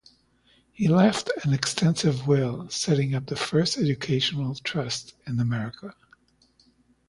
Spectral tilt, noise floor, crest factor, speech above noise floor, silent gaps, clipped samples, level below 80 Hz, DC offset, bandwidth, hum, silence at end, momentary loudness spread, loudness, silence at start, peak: -5.5 dB/octave; -63 dBFS; 20 dB; 38 dB; none; under 0.1%; -58 dBFS; under 0.1%; 11.5 kHz; none; 1.15 s; 10 LU; -25 LUFS; 0.8 s; -6 dBFS